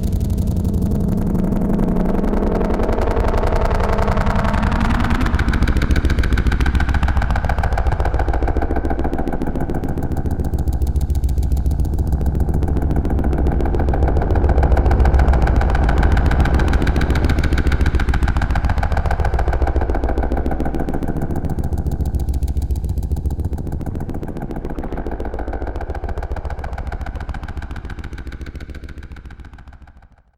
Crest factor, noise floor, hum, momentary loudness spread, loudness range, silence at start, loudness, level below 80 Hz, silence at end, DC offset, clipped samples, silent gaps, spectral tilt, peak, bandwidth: 16 dB; -46 dBFS; none; 11 LU; 10 LU; 0 s; -20 LUFS; -20 dBFS; 0.4 s; under 0.1%; under 0.1%; none; -7.5 dB/octave; -2 dBFS; 15.5 kHz